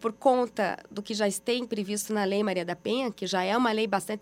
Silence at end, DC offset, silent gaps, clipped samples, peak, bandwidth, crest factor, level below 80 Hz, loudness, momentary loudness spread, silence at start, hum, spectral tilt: 0 s; under 0.1%; none; under 0.1%; -10 dBFS; 16 kHz; 18 dB; -70 dBFS; -28 LUFS; 6 LU; 0 s; none; -4 dB/octave